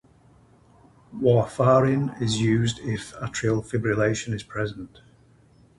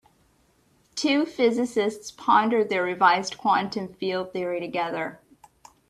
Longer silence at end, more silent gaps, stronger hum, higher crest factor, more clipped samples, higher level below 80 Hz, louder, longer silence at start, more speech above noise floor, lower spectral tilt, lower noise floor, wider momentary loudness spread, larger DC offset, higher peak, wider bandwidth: first, 0.9 s vs 0.75 s; neither; neither; about the same, 20 dB vs 22 dB; neither; first, -52 dBFS vs -68 dBFS; about the same, -24 LUFS vs -24 LUFS; first, 1.1 s vs 0.95 s; second, 33 dB vs 40 dB; first, -6 dB/octave vs -4 dB/octave; second, -56 dBFS vs -63 dBFS; about the same, 12 LU vs 10 LU; neither; about the same, -6 dBFS vs -4 dBFS; second, 11.5 kHz vs 13 kHz